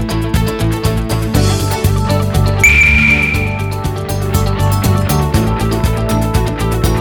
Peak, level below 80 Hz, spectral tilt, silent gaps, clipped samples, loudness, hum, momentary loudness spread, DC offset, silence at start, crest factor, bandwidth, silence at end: 0 dBFS; -20 dBFS; -5.5 dB/octave; none; under 0.1%; -13 LUFS; none; 9 LU; under 0.1%; 0 s; 12 dB; over 20 kHz; 0 s